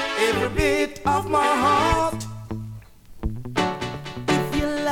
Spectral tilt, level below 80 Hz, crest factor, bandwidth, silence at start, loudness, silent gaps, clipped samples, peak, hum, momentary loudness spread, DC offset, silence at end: -5 dB/octave; -38 dBFS; 18 dB; 18.5 kHz; 0 s; -22 LUFS; none; under 0.1%; -4 dBFS; none; 15 LU; under 0.1%; 0 s